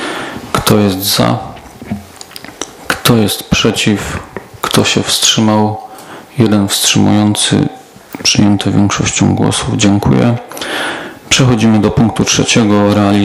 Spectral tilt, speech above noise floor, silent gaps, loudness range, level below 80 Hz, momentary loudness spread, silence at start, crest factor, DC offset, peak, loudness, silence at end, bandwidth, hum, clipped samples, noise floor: -4 dB/octave; 21 dB; none; 3 LU; -36 dBFS; 16 LU; 0 s; 12 dB; under 0.1%; 0 dBFS; -11 LUFS; 0 s; 16.5 kHz; none; 0.3%; -31 dBFS